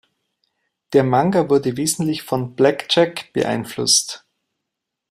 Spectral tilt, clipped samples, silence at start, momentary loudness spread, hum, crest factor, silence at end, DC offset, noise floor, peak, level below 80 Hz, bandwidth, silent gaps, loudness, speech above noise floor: -4 dB/octave; under 0.1%; 0.9 s; 8 LU; none; 18 dB; 0.95 s; under 0.1%; -81 dBFS; -2 dBFS; -60 dBFS; 16 kHz; none; -18 LUFS; 63 dB